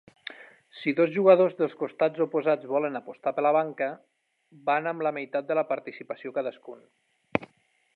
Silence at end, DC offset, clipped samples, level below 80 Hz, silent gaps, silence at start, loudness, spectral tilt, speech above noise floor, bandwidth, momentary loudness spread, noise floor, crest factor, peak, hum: 0.5 s; under 0.1%; under 0.1%; -70 dBFS; none; 0.3 s; -27 LUFS; -8.5 dB/octave; 40 dB; 4.6 kHz; 17 LU; -66 dBFS; 24 dB; -4 dBFS; none